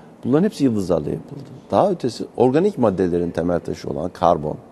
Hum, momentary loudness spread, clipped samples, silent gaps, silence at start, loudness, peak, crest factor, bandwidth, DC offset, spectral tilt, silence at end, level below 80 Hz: none; 10 LU; under 0.1%; none; 0.05 s; -20 LUFS; 0 dBFS; 20 dB; 12.5 kHz; under 0.1%; -7.5 dB/octave; 0.1 s; -48 dBFS